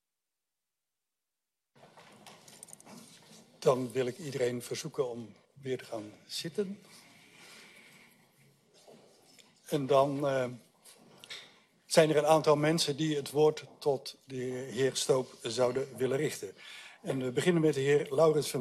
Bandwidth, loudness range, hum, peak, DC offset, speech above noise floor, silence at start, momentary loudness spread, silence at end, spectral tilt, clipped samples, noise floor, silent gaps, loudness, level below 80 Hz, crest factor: 13.5 kHz; 13 LU; none; -8 dBFS; under 0.1%; 59 dB; 1.95 s; 23 LU; 0 s; -5 dB/octave; under 0.1%; -90 dBFS; none; -31 LUFS; -76 dBFS; 24 dB